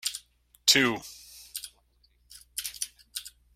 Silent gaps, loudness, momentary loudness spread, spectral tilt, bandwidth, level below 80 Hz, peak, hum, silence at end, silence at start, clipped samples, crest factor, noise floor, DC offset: none; -27 LUFS; 22 LU; -1 dB/octave; 16.5 kHz; -64 dBFS; -4 dBFS; 60 Hz at -65 dBFS; 0.25 s; 0.05 s; under 0.1%; 28 dB; -66 dBFS; under 0.1%